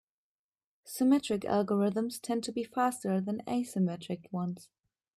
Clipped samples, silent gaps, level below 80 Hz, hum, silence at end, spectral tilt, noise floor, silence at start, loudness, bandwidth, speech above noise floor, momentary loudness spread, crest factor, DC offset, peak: under 0.1%; none; -74 dBFS; none; 0.55 s; -6 dB/octave; under -90 dBFS; 0.85 s; -32 LUFS; 14.5 kHz; over 59 dB; 11 LU; 18 dB; under 0.1%; -14 dBFS